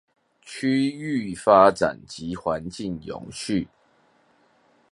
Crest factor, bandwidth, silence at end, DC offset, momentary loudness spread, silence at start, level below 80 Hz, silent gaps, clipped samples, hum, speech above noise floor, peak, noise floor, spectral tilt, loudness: 24 dB; 11.5 kHz; 1.25 s; under 0.1%; 19 LU; 0.45 s; -56 dBFS; none; under 0.1%; none; 39 dB; -2 dBFS; -62 dBFS; -5.5 dB/octave; -23 LUFS